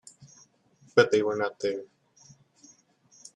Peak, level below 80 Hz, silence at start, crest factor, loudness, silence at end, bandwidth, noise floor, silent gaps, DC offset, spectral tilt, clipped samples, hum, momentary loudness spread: -8 dBFS; -74 dBFS; 0.2 s; 22 dB; -26 LUFS; 1.5 s; 10.5 kHz; -62 dBFS; none; under 0.1%; -4.5 dB/octave; under 0.1%; none; 10 LU